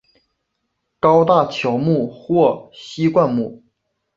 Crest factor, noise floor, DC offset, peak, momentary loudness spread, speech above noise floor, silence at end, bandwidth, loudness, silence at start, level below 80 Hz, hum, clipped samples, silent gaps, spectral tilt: 18 dB; -74 dBFS; under 0.1%; -2 dBFS; 12 LU; 57 dB; 0.6 s; 7.6 kHz; -17 LUFS; 1.05 s; -56 dBFS; none; under 0.1%; none; -7.5 dB/octave